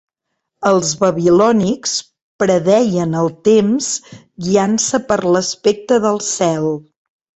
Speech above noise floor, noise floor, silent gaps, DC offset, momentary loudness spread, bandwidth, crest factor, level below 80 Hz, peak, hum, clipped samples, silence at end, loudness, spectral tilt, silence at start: 60 dB; -75 dBFS; 2.22-2.39 s; under 0.1%; 8 LU; 8.2 kHz; 16 dB; -54 dBFS; 0 dBFS; none; under 0.1%; 0.6 s; -15 LUFS; -4.5 dB/octave; 0.6 s